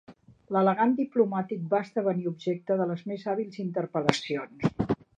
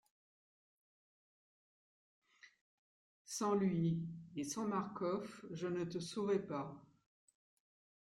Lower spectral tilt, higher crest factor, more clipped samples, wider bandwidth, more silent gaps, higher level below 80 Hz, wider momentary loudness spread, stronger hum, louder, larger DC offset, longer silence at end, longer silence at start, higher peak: about the same, -6.5 dB/octave vs -6 dB/octave; first, 26 dB vs 18 dB; neither; second, 9.6 kHz vs 13 kHz; second, none vs 2.61-3.25 s; first, -58 dBFS vs -80 dBFS; second, 7 LU vs 11 LU; neither; first, -28 LUFS vs -40 LUFS; neither; second, 0.25 s vs 1.15 s; second, 0.1 s vs 2.45 s; first, -2 dBFS vs -26 dBFS